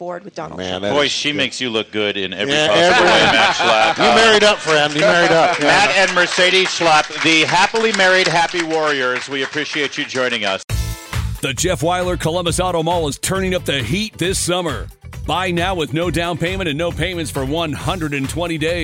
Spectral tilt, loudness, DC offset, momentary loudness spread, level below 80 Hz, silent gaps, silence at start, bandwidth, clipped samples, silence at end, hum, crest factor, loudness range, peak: -3.5 dB/octave; -15 LUFS; under 0.1%; 10 LU; -36 dBFS; 10.64-10.68 s; 0 s; 16.5 kHz; under 0.1%; 0 s; none; 14 dB; 8 LU; -4 dBFS